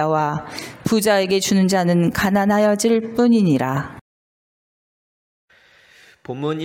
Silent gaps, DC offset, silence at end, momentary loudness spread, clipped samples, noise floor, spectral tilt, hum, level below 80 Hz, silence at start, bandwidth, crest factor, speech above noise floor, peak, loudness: 4.01-5.48 s; under 0.1%; 0 s; 11 LU; under 0.1%; -52 dBFS; -5.5 dB/octave; none; -52 dBFS; 0 s; 17 kHz; 14 dB; 34 dB; -4 dBFS; -18 LUFS